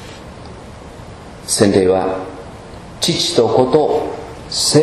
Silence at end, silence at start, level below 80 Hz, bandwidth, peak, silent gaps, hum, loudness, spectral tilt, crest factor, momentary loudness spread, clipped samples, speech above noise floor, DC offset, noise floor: 0 s; 0 s; -42 dBFS; 13.5 kHz; 0 dBFS; none; none; -15 LUFS; -4 dB/octave; 16 dB; 22 LU; under 0.1%; 20 dB; under 0.1%; -34 dBFS